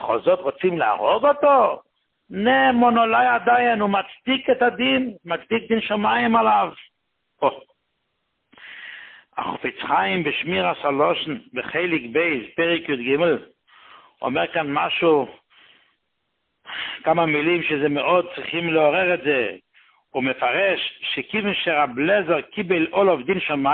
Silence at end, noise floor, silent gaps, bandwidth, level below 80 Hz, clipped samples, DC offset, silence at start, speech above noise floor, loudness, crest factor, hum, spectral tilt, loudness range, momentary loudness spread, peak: 0 s; -75 dBFS; none; 4.4 kHz; -62 dBFS; under 0.1%; under 0.1%; 0 s; 54 dB; -20 LUFS; 16 dB; none; -10 dB/octave; 6 LU; 11 LU; -4 dBFS